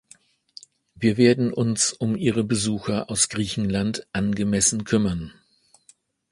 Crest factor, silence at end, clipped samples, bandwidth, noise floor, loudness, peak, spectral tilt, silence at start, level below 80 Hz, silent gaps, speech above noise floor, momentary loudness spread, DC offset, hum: 20 dB; 1 s; under 0.1%; 11.5 kHz; -59 dBFS; -22 LUFS; -4 dBFS; -4.5 dB/octave; 1 s; -50 dBFS; none; 36 dB; 8 LU; under 0.1%; none